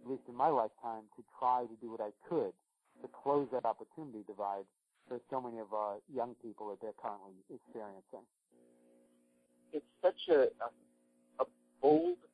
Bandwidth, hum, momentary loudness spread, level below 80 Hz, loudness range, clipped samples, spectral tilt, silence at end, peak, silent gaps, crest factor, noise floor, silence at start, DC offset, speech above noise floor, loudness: 10.5 kHz; none; 21 LU; -84 dBFS; 10 LU; under 0.1%; -7.5 dB/octave; 0.2 s; -18 dBFS; none; 20 dB; -72 dBFS; 0 s; under 0.1%; 35 dB; -37 LUFS